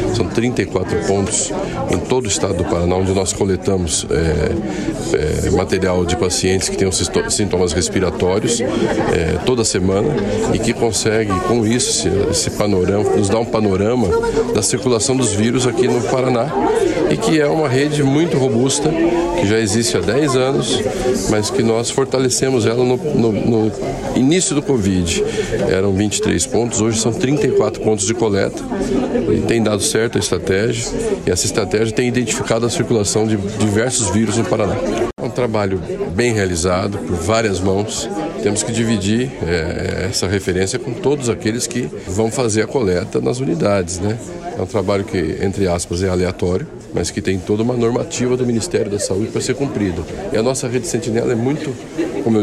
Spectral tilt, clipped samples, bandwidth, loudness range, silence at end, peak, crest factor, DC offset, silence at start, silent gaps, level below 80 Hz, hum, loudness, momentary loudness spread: -4.5 dB/octave; under 0.1%; 14 kHz; 3 LU; 0 s; -2 dBFS; 14 dB; under 0.1%; 0 s; none; -36 dBFS; none; -17 LUFS; 5 LU